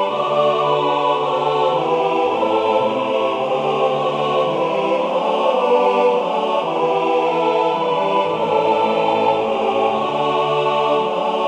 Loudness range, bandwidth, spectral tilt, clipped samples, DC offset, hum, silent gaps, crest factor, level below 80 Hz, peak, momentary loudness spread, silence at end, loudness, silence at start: 1 LU; 9.8 kHz; -5.5 dB/octave; under 0.1%; under 0.1%; none; none; 14 dB; -64 dBFS; -4 dBFS; 3 LU; 0 s; -18 LUFS; 0 s